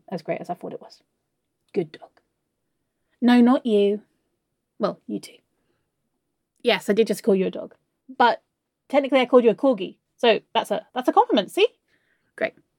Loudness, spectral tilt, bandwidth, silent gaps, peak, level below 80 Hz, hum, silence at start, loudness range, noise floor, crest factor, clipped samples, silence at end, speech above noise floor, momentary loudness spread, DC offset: -22 LUFS; -5.5 dB/octave; 16.5 kHz; none; -4 dBFS; -80 dBFS; none; 0.1 s; 6 LU; -77 dBFS; 20 dB; under 0.1%; 0.3 s; 56 dB; 17 LU; under 0.1%